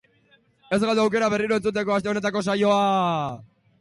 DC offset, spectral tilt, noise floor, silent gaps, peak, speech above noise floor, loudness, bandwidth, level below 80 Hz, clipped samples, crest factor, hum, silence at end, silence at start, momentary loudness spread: under 0.1%; -5.5 dB/octave; -61 dBFS; none; -10 dBFS; 39 dB; -23 LUFS; 11.5 kHz; -60 dBFS; under 0.1%; 14 dB; none; 0.35 s; 0.7 s; 7 LU